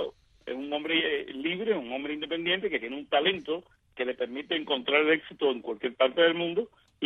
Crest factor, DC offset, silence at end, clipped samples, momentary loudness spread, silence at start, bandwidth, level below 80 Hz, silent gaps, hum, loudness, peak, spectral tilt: 20 dB; under 0.1%; 0 s; under 0.1%; 11 LU; 0 s; 4.6 kHz; -68 dBFS; none; none; -28 LUFS; -10 dBFS; -6.5 dB/octave